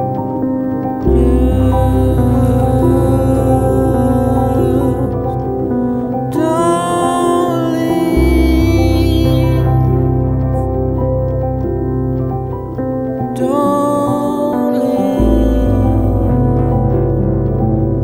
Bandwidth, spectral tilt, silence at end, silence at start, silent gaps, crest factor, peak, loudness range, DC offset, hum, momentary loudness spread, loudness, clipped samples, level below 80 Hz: 16 kHz; -8 dB/octave; 0 s; 0 s; none; 12 dB; 0 dBFS; 4 LU; under 0.1%; none; 6 LU; -14 LUFS; under 0.1%; -20 dBFS